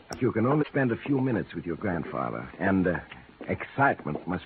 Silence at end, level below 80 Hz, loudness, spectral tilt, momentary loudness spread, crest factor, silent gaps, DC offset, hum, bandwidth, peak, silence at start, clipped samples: 0 s; -56 dBFS; -28 LUFS; -6.5 dB/octave; 9 LU; 18 dB; none; under 0.1%; none; 4.6 kHz; -10 dBFS; 0.1 s; under 0.1%